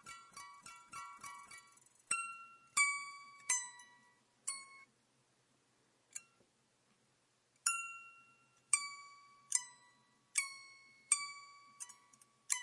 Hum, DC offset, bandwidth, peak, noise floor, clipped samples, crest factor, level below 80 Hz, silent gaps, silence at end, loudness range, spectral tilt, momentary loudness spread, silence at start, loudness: none; under 0.1%; 11.5 kHz; -14 dBFS; -77 dBFS; under 0.1%; 32 dB; under -90 dBFS; none; 0 s; 12 LU; 3.5 dB/octave; 21 LU; 0.05 s; -39 LUFS